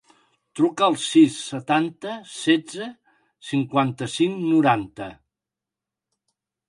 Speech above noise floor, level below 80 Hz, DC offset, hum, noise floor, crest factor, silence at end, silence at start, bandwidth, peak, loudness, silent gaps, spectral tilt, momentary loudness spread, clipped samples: 66 dB; -66 dBFS; under 0.1%; none; -88 dBFS; 18 dB; 1.55 s; 0.55 s; 11.5 kHz; -4 dBFS; -21 LUFS; none; -5 dB/octave; 18 LU; under 0.1%